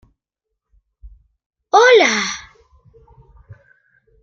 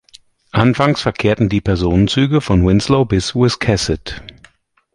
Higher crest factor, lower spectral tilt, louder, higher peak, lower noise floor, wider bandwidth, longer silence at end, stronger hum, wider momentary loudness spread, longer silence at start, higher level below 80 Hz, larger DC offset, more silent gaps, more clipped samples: about the same, 18 dB vs 14 dB; second, -1.5 dB/octave vs -6 dB/octave; about the same, -13 LUFS vs -15 LUFS; about the same, 0 dBFS vs 0 dBFS; first, -80 dBFS vs -50 dBFS; second, 7.6 kHz vs 11.5 kHz; about the same, 0.7 s vs 0.65 s; neither; first, 15 LU vs 7 LU; first, 1.05 s vs 0.55 s; second, -52 dBFS vs -30 dBFS; neither; first, 1.46-1.50 s vs none; neither